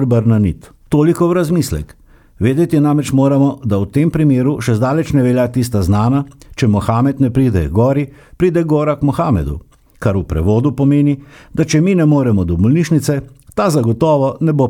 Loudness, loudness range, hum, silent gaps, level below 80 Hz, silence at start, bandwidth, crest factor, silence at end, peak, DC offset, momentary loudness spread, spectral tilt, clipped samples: -14 LUFS; 2 LU; none; none; -34 dBFS; 0 s; 17 kHz; 12 dB; 0 s; -2 dBFS; under 0.1%; 7 LU; -7.5 dB/octave; under 0.1%